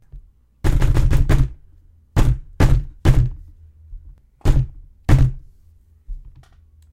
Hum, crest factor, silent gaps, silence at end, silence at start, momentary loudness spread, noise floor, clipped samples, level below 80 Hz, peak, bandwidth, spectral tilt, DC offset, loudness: none; 18 dB; none; 0.65 s; 0.15 s; 23 LU; -50 dBFS; under 0.1%; -20 dBFS; 0 dBFS; 13.5 kHz; -7 dB/octave; under 0.1%; -20 LUFS